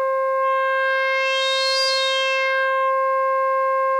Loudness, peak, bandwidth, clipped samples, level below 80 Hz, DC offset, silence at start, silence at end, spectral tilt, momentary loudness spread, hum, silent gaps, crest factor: -19 LUFS; -8 dBFS; 13.5 kHz; under 0.1%; under -90 dBFS; under 0.1%; 0 s; 0 s; 5 dB/octave; 2 LU; none; none; 12 dB